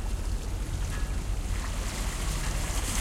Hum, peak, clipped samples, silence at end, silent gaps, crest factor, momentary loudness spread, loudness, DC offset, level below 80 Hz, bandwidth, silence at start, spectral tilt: none; -16 dBFS; under 0.1%; 0 s; none; 14 dB; 3 LU; -33 LUFS; under 0.1%; -32 dBFS; 16 kHz; 0 s; -4 dB/octave